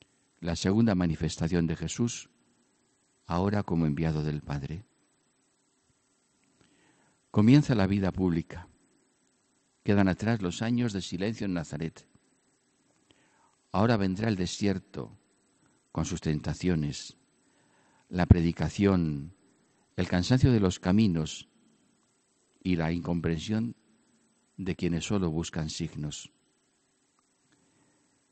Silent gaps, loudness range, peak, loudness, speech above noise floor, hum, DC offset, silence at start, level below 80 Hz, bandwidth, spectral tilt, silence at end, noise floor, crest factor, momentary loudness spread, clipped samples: none; 7 LU; -6 dBFS; -29 LUFS; 44 dB; none; under 0.1%; 0.4 s; -50 dBFS; 8.8 kHz; -6.5 dB/octave; 2.05 s; -71 dBFS; 24 dB; 15 LU; under 0.1%